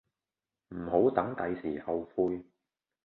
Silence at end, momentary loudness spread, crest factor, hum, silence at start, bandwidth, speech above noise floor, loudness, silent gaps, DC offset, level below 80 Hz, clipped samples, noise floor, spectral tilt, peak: 0.65 s; 14 LU; 22 dB; none; 0.7 s; 4.2 kHz; over 59 dB; -32 LUFS; none; under 0.1%; -62 dBFS; under 0.1%; under -90 dBFS; -10.5 dB/octave; -10 dBFS